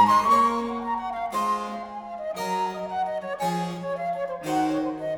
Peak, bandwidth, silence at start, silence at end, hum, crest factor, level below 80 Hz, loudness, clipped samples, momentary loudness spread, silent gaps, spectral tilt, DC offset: -8 dBFS; 19.5 kHz; 0 s; 0 s; none; 18 dB; -58 dBFS; -26 LUFS; under 0.1%; 11 LU; none; -5 dB/octave; under 0.1%